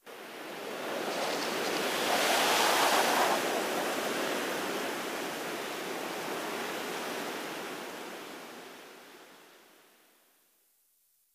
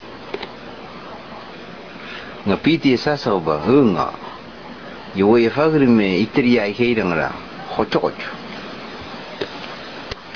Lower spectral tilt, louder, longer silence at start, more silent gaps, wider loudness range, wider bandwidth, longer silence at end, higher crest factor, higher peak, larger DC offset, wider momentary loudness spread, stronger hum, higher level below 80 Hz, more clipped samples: second, -1.5 dB/octave vs -7 dB/octave; second, -31 LUFS vs -18 LUFS; about the same, 0.05 s vs 0 s; neither; first, 17 LU vs 6 LU; first, 16 kHz vs 5.4 kHz; first, 1.8 s vs 0 s; about the same, 20 dB vs 16 dB; second, -14 dBFS vs -2 dBFS; second, under 0.1% vs 0.4%; about the same, 19 LU vs 20 LU; neither; second, -78 dBFS vs -48 dBFS; neither